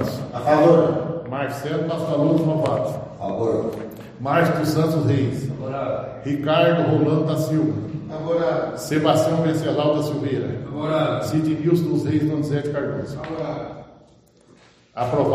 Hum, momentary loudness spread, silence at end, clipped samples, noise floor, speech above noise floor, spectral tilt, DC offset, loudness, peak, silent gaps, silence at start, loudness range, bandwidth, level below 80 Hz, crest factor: none; 11 LU; 0 s; under 0.1%; -53 dBFS; 32 dB; -7 dB/octave; under 0.1%; -21 LUFS; -2 dBFS; none; 0 s; 3 LU; 15 kHz; -54 dBFS; 18 dB